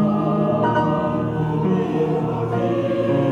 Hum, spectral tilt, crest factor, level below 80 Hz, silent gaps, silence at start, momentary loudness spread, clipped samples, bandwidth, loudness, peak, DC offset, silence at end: none; -9 dB/octave; 12 dB; -48 dBFS; none; 0 s; 3 LU; under 0.1%; 7.2 kHz; -20 LUFS; -8 dBFS; under 0.1%; 0 s